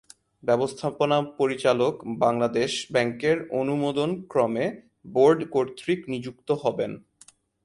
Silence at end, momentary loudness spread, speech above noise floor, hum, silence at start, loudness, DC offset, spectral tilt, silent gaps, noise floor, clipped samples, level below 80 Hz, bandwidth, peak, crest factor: 0.65 s; 9 LU; 32 dB; none; 0.45 s; -25 LUFS; under 0.1%; -5.5 dB/octave; none; -56 dBFS; under 0.1%; -64 dBFS; 11.5 kHz; -6 dBFS; 18 dB